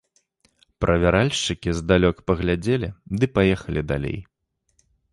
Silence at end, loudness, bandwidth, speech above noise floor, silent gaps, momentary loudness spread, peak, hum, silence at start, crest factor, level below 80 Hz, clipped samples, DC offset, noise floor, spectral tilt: 0.9 s; -22 LUFS; 11.5 kHz; 51 dB; none; 8 LU; -4 dBFS; none; 0.8 s; 20 dB; -36 dBFS; under 0.1%; under 0.1%; -73 dBFS; -6 dB/octave